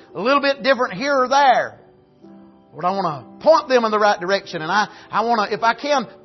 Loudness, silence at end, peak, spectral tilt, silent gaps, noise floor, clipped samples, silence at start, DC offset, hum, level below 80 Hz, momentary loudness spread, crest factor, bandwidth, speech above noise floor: -18 LUFS; 0.15 s; -4 dBFS; -4 dB/octave; none; -47 dBFS; under 0.1%; 0.15 s; under 0.1%; none; -66 dBFS; 8 LU; 16 dB; 6.2 kHz; 29 dB